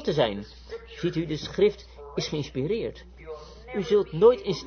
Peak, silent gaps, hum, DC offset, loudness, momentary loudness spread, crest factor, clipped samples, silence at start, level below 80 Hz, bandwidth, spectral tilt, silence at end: -8 dBFS; none; none; under 0.1%; -26 LUFS; 21 LU; 20 dB; under 0.1%; 0 s; -48 dBFS; 6.6 kHz; -6 dB/octave; 0 s